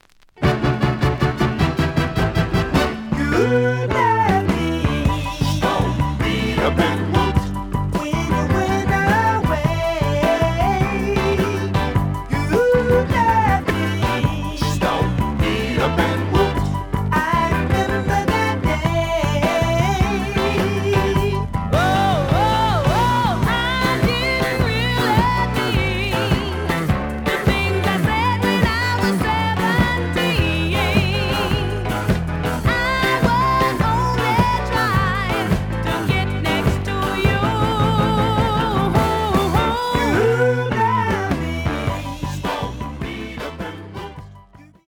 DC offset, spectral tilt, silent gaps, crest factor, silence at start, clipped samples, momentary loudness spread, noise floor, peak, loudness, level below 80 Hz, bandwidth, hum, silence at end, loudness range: under 0.1%; -6 dB/octave; none; 18 dB; 0.35 s; under 0.1%; 5 LU; -45 dBFS; -2 dBFS; -19 LUFS; -30 dBFS; over 20 kHz; none; 0.25 s; 2 LU